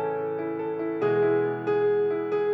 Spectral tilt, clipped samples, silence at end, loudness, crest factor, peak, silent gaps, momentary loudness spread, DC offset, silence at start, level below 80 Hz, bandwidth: -9 dB/octave; under 0.1%; 0 s; -26 LUFS; 10 dB; -14 dBFS; none; 7 LU; under 0.1%; 0 s; -86 dBFS; 5 kHz